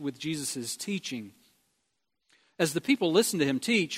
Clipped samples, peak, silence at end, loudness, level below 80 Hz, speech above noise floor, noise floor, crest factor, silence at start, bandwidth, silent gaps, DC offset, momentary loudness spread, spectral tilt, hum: under 0.1%; -10 dBFS; 0 s; -28 LUFS; -74 dBFS; 51 dB; -80 dBFS; 20 dB; 0 s; 16 kHz; none; under 0.1%; 11 LU; -3.5 dB/octave; none